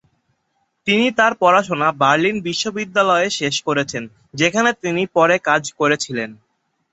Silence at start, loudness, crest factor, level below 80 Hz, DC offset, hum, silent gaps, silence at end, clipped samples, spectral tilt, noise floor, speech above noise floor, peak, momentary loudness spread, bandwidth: 0.85 s; -17 LUFS; 18 dB; -60 dBFS; under 0.1%; none; none; 0.6 s; under 0.1%; -3.5 dB/octave; -69 dBFS; 51 dB; 0 dBFS; 10 LU; 8.4 kHz